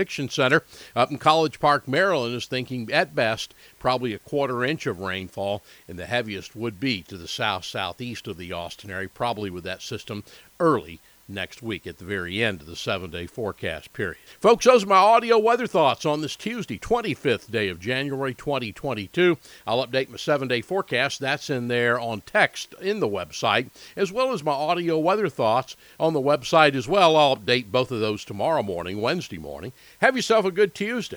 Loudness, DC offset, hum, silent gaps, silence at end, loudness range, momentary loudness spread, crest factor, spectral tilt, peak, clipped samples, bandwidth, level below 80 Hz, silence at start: -24 LUFS; under 0.1%; none; none; 0 s; 9 LU; 14 LU; 22 dB; -4.5 dB/octave; -2 dBFS; under 0.1%; over 20 kHz; -56 dBFS; 0 s